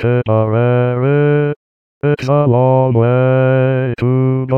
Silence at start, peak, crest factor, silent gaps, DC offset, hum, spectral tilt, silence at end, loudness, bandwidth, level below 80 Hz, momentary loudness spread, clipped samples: 0 s; -2 dBFS; 10 dB; 1.56-2.01 s; 0.3%; none; -10 dB/octave; 0 s; -13 LUFS; 6 kHz; -48 dBFS; 5 LU; under 0.1%